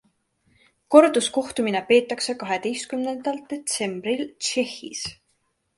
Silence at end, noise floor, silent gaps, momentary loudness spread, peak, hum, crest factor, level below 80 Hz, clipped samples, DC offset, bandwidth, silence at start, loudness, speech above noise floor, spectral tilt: 0.65 s; -71 dBFS; none; 13 LU; 0 dBFS; none; 24 dB; -64 dBFS; under 0.1%; under 0.1%; 11.5 kHz; 0.9 s; -23 LUFS; 48 dB; -3 dB/octave